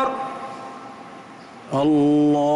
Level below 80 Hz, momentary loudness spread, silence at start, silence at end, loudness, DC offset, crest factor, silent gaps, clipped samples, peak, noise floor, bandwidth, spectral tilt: -62 dBFS; 23 LU; 0 s; 0 s; -20 LUFS; under 0.1%; 10 dB; none; under 0.1%; -12 dBFS; -41 dBFS; 9.8 kHz; -7.5 dB/octave